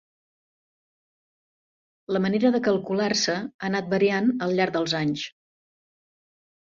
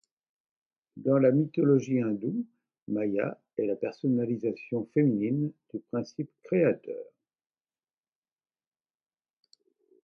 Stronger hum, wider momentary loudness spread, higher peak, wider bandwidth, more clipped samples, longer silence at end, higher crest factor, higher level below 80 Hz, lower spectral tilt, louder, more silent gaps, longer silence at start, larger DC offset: neither; second, 7 LU vs 12 LU; first, -8 dBFS vs -12 dBFS; first, 7.8 kHz vs 6.8 kHz; neither; second, 1.35 s vs 3 s; about the same, 18 dB vs 18 dB; first, -66 dBFS vs -76 dBFS; second, -4.5 dB/octave vs -9.5 dB/octave; first, -24 LUFS vs -29 LUFS; about the same, 3.54-3.59 s vs 2.82-2.86 s; first, 2.1 s vs 0.95 s; neither